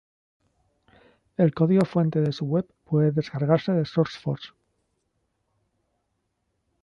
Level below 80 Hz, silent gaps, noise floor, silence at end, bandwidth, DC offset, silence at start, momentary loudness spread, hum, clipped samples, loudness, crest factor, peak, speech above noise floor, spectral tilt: -64 dBFS; none; -76 dBFS; 2.35 s; 6.8 kHz; under 0.1%; 1.4 s; 11 LU; none; under 0.1%; -24 LUFS; 20 dB; -6 dBFS; 53 dB; -9 dB/octave